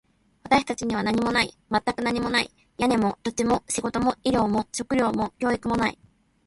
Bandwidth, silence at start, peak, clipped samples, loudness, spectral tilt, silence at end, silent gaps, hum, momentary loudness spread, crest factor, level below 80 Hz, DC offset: 11.5 kHz; 0.45 s; -6 dBFS; under 0.1%; -25 LUFS; -4 dB/octave; 0.55 s; none; none; 4 LU; 18 dB; -50 dBFS; under 0.1%